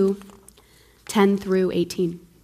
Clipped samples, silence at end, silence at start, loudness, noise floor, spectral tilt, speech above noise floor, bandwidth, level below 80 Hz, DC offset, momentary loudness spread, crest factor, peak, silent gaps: under 0.1%; 0.25 s; 0 s; -23 LUFS; -54 dBFS; -6 dB/octave; 33 dB; 16 kHz; -56 dBFS; under 0.1%; 11 LU; 16 dB; -8 dBFS; none